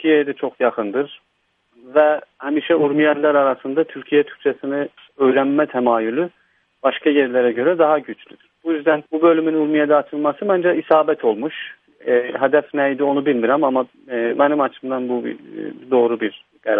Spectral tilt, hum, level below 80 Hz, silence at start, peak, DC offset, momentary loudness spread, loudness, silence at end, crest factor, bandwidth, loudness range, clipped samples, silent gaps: -9 dB/octave; none; -72 dBFS; 0 s; 0 dBFS; under 0.1%; 11 LU; -18 LUFS; 0 s; 18 dB; 3.8 kHz; 2 LU; under 0.1%; none